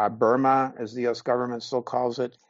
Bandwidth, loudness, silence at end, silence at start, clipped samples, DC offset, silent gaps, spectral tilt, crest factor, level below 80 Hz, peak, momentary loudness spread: 7.6 kHz; -25 LUFS; 0.2 s; 0 s; under 0.1%; under 0.1%; none; -4.5 dB/octave; 16 dB; -72 dBFS; -8 dBFS; 8 LU